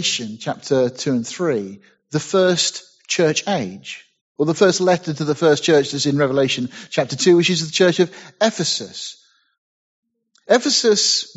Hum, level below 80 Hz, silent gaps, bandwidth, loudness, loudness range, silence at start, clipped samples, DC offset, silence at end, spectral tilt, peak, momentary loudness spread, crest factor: none; -64 dBFS; 4.21-4.35 s, 9.58-10.03 s; 8.2 kHz; -18 LUFS; 4 LU; 0 s; under 0.1%; under 0.1%; 0.1 s; -3.5 dB/octave; 0 dBFS; 13 LU; 18 dB